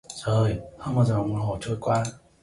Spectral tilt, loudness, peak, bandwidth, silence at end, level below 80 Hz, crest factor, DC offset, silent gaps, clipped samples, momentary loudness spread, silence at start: -7 dB/octave; -26 LUFS; -10 dBFS; 11.5 kHz; 0.25 s; -48 dBFS; 14 dB; under 0.1%; none; under 0.1%; 6 LU; 0.1 s